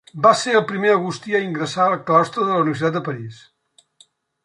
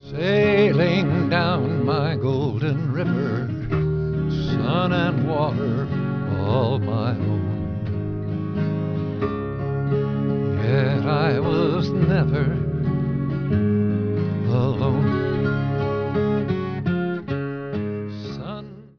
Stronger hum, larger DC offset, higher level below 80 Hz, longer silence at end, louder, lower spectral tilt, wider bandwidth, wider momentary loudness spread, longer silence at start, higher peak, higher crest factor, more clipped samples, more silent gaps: neither; second, under 0.1% vs 0.3%; second, -68 dBFS vs -42 dBFS; first, 1.1 s vs 0.1 s; first, -19 LUFS vs -22 LUFS; second, -5 dB/octave vs -9 dB/octave; first, 11 kHz vs 5.4 kHz; first, 10 LU vs 7 LU; first, 0.15 s vs 0 s; first, -2 dBFS vs -6 dBFS; about the same, 18 dB vs 16 dB; neither; neither